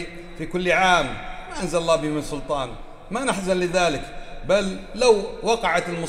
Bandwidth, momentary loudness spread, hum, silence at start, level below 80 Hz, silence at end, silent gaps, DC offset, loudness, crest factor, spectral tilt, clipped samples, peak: 15 kHz; 15 LU; none; 0 s; -40 dBFS; 0 s; none; under 0.1%; -22 LUFS; 20 dB; -4 dB/octave; under 0.1%; -4 dBFS